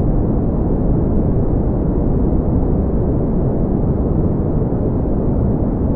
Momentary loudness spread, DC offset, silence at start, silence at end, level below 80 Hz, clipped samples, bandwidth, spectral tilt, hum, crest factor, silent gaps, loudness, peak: 1 LU; under 0.1%; 0 s; 0 s; -20 dBFS; under 0.1%; 2.5 kHz; -15 dB/octave; none; 12 dB; none; -18 LUFS; -4 dBFS